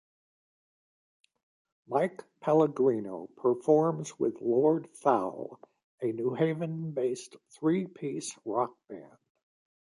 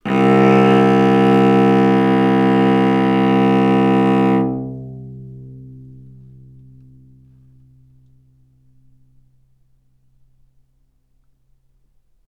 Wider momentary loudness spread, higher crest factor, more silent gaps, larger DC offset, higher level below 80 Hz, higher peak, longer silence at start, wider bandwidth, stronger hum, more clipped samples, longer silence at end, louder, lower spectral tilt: second, 14 LU vs 22 LU; about the same, 20 dB vs 16 dB; first, 5.84-5.98 s vs none; neither; second, -80 dBFS vs -48 dBFS; second, -10 dBFS vs 0 dBFS; first, 1.9 s vs 0.05 s; first, 11.5 kHz vs 9.2 kHz; neither; neither; second, 0.8 s vs 6.45 s; second, -30 LUFS vs -14 LUFS; second, -7 dB/octave vs -8.5 dB/octave